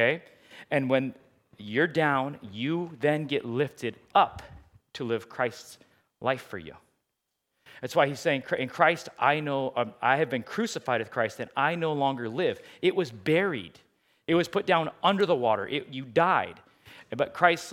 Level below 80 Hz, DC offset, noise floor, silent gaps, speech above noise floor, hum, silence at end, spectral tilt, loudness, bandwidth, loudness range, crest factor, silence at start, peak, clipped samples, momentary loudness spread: -68 dBFS; under 0.1%; -82 dBFS; none; 55 dB; none; 0 s; -5.5 dB/octave; -27 LUFS; 16 kHz; 5 LU; 24 dB; 0 s; -4 dBFS; under 0.1%; 12 LU